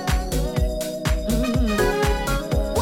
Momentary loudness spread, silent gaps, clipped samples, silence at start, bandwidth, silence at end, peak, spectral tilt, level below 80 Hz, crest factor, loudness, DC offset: 4 LU; none; under 0.1%; 0 s; 17 kHz; 0 s; -8 dBFS; -5.5 dB/octave; -26 dBFS; 14 dB; -23 LUFS; under 0.1%